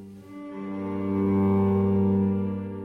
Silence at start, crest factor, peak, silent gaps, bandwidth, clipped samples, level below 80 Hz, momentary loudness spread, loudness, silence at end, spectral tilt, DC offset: 0 s; 12 dB; -14 dBFS; none; 3.7 kHz; under 0.1%; -58 dBFS; 16 LU; -25 LUFS; 0 s; -11 dB/octave; under 0.1%